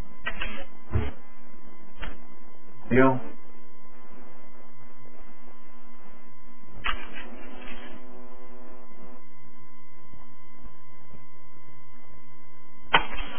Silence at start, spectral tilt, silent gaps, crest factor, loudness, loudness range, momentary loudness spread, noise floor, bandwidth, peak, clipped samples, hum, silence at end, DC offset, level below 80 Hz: 0 s; -9 dB/octave; none; 28 dB; -29 LUFS; 23 LU; 29 LU; -54 dBFS; 3.5 kHz; -4 dBFS; under 0.1%; none; 0 s; 8%; -44 dBFS